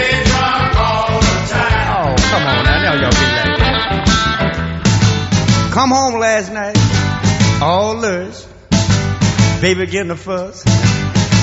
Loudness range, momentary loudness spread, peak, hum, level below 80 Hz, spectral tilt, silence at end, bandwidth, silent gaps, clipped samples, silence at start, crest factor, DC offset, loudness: 2 LU; 5 LU; 0 dBFS; none; -24 dBFS; -4.5 dB/octave; 0 s; 8 kHz; none; under 0.1%; 0 s; 14 dB; under 0.1%; -14 LUFS